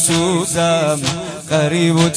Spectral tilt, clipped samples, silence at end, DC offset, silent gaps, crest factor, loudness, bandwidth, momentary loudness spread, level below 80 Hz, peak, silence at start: -4 dB/octave; under 0.1%; 0 s; under 0.1%; none; 16 dB; -16 LUFS; 11 kHz; 6 LU; -46 dBFS; 0 dBFS; 0 s